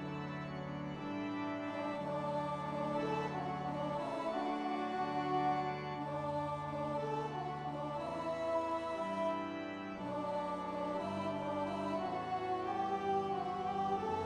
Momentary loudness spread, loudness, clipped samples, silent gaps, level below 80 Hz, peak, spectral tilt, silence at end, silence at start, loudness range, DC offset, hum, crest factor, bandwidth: 5 LU; -39 LUFS; under 0.1%; none; -68 dBFS; -24 dBFS; -7 dB/octave; 0 s; 0 s; 2 LU; under 0.1%; none; 14 dB; 11.5 kHz